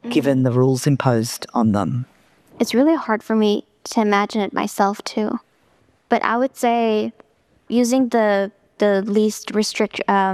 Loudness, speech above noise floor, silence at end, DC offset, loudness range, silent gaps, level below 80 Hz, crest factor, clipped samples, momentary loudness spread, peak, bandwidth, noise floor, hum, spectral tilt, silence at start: -19 LUFS; 41 dB; 0 s; under 0.1%; 2 LU; none; -64 dBFS; 18 dB; under 0.1%; 8 LU; -2 dBFS; 14.5 kHz; -59 dBFS; none; -5.5 dB/octave; 0.05 s